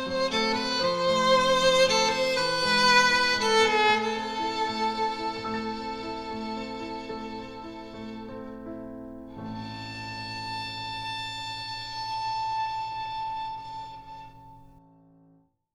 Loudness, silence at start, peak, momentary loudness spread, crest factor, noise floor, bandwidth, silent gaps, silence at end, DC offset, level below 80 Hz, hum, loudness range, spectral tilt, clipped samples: -26 LUFS; 0 s; -8 dBFS; 19 LU; 20 dB; -62 dBFS; 15 kHz; none; 1.1 s; under 0.1%; -54 dBFS; none; 16 LU; -2.5 dB/octave; under 0.1%